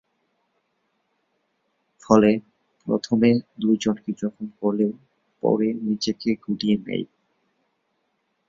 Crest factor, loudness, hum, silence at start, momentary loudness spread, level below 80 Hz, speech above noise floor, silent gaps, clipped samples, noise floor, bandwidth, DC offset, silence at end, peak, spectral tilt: 22 dB; -23 LUFS; none; 2.1 s; 11 LU; -62 dBFS; 51 dB; none; under 0.1%; -73 dBFS; 7.6 kHz; under 0.1%; 1.45 s; -2 dBFS; -6.5 dB/octave